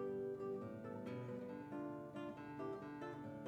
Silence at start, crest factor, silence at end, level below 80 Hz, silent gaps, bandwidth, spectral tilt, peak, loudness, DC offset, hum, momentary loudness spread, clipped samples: 0 s; 12 dB; 0 s; -80 dBFS; none; 14.5 kHz; -8 dB/octave; -36 dBFS; -49 LUFS; under 0.1%; none; 4 LU; under 0.1%